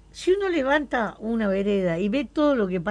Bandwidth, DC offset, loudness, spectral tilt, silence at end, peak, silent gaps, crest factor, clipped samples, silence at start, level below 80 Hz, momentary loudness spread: 11 kHz; under 0.1%; -24 LUFS; -6.5 dB/octave; 0 s; -10 dBFS; none; 14 dB; under 0.1%; 0.15 s; -50 dBFS; 5 LU